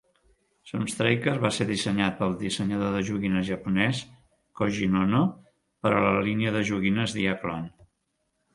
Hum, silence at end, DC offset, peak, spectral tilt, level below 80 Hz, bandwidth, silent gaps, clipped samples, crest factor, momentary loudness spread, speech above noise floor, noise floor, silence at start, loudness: none; 0.85 s; under 0.1%; -6 dBFS; -5.5 dB/octave; -54 dBFS; 11.5 kHz; none; under 0.1%; 20 dB; 8 LU; 51 dB; -76 dBFS; 0.65 s; -26 LUFS